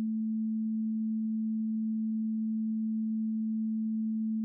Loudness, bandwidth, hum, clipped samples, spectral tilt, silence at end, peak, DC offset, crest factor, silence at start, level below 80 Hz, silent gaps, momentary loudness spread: -32 LUFS; 0.4 kHz; none; under 0.1%; -18 dB/octave; 0 s; -28 dBFS; under 0.1%; 4 dB; 0 s; under -90 dBFS; none; 0 LU